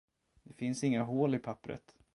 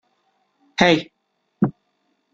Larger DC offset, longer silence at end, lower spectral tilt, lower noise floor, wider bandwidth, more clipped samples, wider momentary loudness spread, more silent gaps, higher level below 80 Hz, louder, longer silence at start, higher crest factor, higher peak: neither; second, 0.35 s vs 0.65 s; about the same, -6.5 dB/octave vs -5.5 dB/octave; second, -60 dBFS vs -69 dBFS; first, 11.5 kHz vs 7.8 kHz; neither; about the same, 14 LU vs 15 LU; neither; second, -70 dBFS vs -58 dBFS; second, -35 LUFS vs -20 LUFS; second, 0.5 s vs 0.8 s; about the same, 18 dB vs 22 dB; second, -18 dBFS vs -2 dBFS